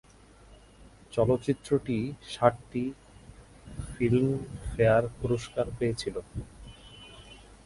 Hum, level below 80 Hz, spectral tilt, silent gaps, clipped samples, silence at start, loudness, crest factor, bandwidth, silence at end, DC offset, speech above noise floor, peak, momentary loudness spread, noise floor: none; -48 dBFS; -7 dB/octave; none; under 0.1%; 0.5 s; -29 LUFS; 24 dB; 11.5 kHz; 0.3 s; under 0.1%; 26 dB; -6 dBFS; 22 LU; -54 dBFS